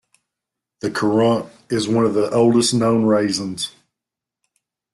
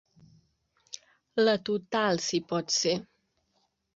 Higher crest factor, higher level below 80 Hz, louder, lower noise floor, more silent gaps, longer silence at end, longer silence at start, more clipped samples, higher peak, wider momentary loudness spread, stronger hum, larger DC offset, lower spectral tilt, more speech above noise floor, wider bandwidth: about the same, 14 dB vs 18 dB; first, -58 dBFS vs -72 dBFS; first, -18 LUFS vs -28 LUFS; first, -86 dBFS vs -75 dBFS; neither; first, 1.25 s vs 0.9 s; about the same, 0.85 s vs 0.95 s; neither; first, -4 dBFS vs -12 dBFS; second, 11 LU vs 19 LU; neither; neither; first, -5 dB/octave vs -3.5 dB/octave; first, 68 dB vs 47 dB; first, 12.5 kHz vs 8 kHz